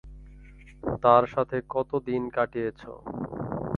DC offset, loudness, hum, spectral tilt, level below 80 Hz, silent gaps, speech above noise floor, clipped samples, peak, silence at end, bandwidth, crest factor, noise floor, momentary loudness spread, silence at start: under 0.1%; -27 LUFS; none; -9 dB/octave; -50 dBFS; none; 22 dB; under 0.1%; -4 dBFS; 0 s; 6.6 kHz; 24 dB; -48 dBFS; 16 LU; 0.05 s